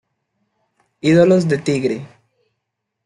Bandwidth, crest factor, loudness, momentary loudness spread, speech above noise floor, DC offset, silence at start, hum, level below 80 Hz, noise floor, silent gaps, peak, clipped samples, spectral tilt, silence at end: 11.5 kHz; 16 dB; -16 LUFS; 11 LU; 62 dB; under 0.1%; 1.05 s; none; -60 dBFS; -77 dBFS; none; -2 dBFS; under 0.1%; -7 dB/octave; 1 s